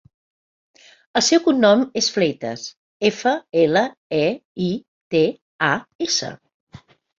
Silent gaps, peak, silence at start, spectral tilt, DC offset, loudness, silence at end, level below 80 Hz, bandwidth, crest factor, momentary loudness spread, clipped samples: 2.77-3.00 s, 3.97-4.10 s, 4.45-4.55 s, 4.88-5.11 s, 5.41-5.59 s, 5.95-5.99 s, 6.54-6.67 s; -2 dBFS; 1.15 s; -3.5 dB/octave; under 0.1%; -20 LUFS; 0.4 s; -62 dBFS; 7.8 kHz; 18 dB; 12 LU; under 0.1%